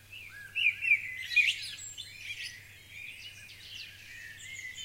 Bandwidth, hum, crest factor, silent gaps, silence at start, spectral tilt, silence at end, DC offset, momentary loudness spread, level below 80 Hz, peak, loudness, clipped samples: 16 kHz; none; 22 dB; none; 0 s; 1 dB/octave; 0 s; under 0.1%; 20 LU; -68 dBFS; -14 dBFS; -30 LUFS; under 0.1%